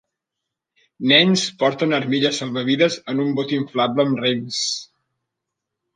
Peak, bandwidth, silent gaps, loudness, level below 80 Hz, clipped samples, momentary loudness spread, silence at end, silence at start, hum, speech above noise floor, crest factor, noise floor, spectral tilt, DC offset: -2 dBFS; 9.8 kHz; none; -19 LUFS; -70 dBFS; under 0.1%; 9 LU; 1.1 s; 1 s; none; 63 dB; 20 dB; -82 dBFS; -4 dB/octave; under 0.1%